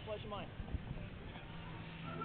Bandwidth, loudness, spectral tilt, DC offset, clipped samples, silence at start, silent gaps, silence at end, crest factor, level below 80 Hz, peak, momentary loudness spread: 4.5 kHz; -48 LUFS; -5 dB/octave; under 0.1%; under 0.1%; 0 s; none; 0 s; 18 dB; -52 dBFS; -28 dBFS; 5 LU